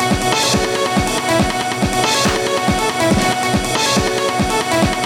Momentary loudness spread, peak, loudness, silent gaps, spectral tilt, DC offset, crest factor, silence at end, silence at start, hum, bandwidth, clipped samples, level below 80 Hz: 3 LU; -2 dBFS; -16 LUFS; none; -3.5 dB/octave; under 0.1%; 14 dB; 0 s; 0 s; none; 20 kHz; under 0.1%; -32 dBFS